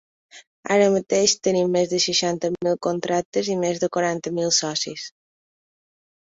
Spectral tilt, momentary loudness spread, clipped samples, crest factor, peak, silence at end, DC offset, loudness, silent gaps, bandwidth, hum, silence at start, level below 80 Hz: -3.5 dB/octave; 7 LU; under 0.1%; 20 dB; -4 dBFS; 1.25 s; under 0.1%; -21 LUFS; 0.47-0.63 s, 3.25-3.32 s; 8.2 kHz; none; 0.35 s; -64 dBFS